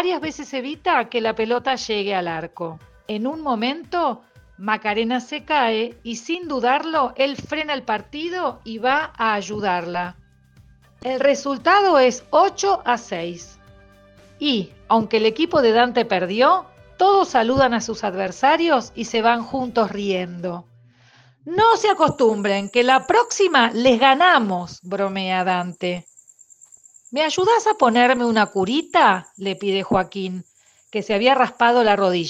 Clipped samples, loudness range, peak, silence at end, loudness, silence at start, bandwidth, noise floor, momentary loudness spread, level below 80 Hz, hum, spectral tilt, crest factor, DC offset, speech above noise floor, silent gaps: under 0.1%; 6 LU; 0 dBFS; 0 s; -19 LUFS; 0 s; 10 kHz; -53 dBFS; 13 LU; -56 dBFS; none; -4 dB/octave; 20 dB; under 0.1%; 34 dB; none